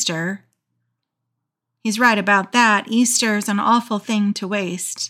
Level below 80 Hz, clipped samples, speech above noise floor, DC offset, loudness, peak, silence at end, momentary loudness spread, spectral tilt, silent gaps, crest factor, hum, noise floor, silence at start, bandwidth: -84 dBFS; under 0.1%; 60 dB; under 0.1%; -18 LUFS; -4 dBFS; 0 s; 10 LU; -3 dB/octave; none; 16 dB; none; -79 dBFS; 0 s; 16 kHz